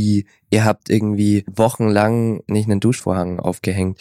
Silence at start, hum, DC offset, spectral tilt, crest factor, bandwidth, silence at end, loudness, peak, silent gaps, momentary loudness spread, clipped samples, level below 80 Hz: 0 s; none; under 0.1%; -6.5 dB/octave; 16 dB; 15 kHz; 0.05 s; -18 LUFS; -2 dBFS; none; 5 LU; under 0.1%; -52 dBFS